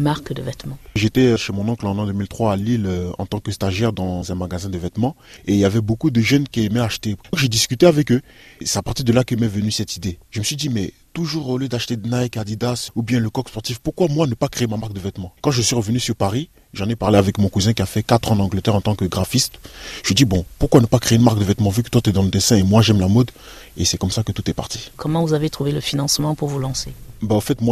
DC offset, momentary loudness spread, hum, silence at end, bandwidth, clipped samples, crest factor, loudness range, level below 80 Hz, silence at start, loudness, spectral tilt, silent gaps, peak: under 0.1%; 11 LU; none; 0 s; 14.5 kHz; under 0.1%; 18 dB; 6 LU; -42 dBFS; 0 s; -19 LUFS; -5 dB/octave; none; 0 dBFS